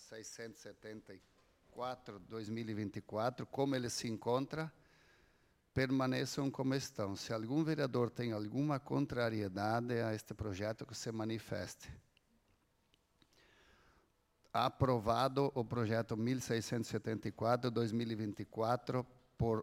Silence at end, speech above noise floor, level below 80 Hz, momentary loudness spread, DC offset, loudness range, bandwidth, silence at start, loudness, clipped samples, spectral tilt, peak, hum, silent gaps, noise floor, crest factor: 0 s; 38 dB; -66 dBFS; 13 LU; under 0.1%; 9 LU; 16.5 kHz; 0 s; -39 LUFS; under 0.1%; -6 dB/octave; -18 dBFS; none; none; -76 dBFS; 20 dB